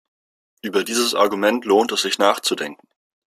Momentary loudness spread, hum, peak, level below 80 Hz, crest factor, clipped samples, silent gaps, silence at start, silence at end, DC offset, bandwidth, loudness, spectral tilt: 9 LU; none; -2 dBFS; -68 dBFS; 20 dB; under 0.1%; none; 0.65 s; 0.65 s; under 0.1%; 15.5 kHz; -19 LUFS; -2.5 dB/octave